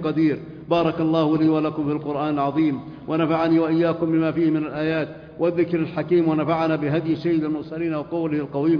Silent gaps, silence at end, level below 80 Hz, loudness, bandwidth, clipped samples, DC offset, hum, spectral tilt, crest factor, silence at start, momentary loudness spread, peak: none; 0 s; -56 dBFS; -22 LUFS; 5.4 kHz; under 0.1%; under 0.1%; none; -9.5 dB/octave; 14 dB; 0 s; 7 LU; -6 dBFS